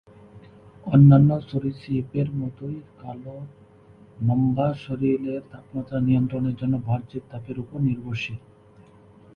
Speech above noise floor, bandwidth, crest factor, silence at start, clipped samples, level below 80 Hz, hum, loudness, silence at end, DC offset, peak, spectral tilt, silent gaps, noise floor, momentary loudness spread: 29 dB; 5.2 kHz; 20 dB; 0.35 s; under 0.1%; -52 dBFS; none; -23 LUFS; 0.95 s; under 0.1%; -4 dBFS; -10 dB/octave; none; -51 dBFS; 20 LU